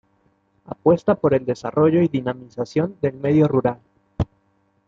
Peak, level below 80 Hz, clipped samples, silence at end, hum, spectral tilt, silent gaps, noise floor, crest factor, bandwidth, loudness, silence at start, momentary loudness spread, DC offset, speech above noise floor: -4 dBFS; -48 dBFS; under 0.1%; 0.65 s; none; -9 dB/octave; none; -64 dBFS; 16 dB; 7.6 kHz; -20 LUFS; 0.7 s; 12 LU; under 0.1%; 45 dB